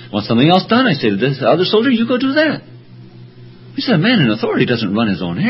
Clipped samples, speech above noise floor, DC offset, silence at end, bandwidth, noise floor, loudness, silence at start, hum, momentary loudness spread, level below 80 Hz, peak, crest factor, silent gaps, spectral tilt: under 0.1%; 24 dB; under 0.1%; 0 s; 5.8 kHz; -37 dBFS; -14 LUFS; 0 s; none; 6 LU; -50 dBFS; 0 dBFS; 14 dB; none; -9 dB/octave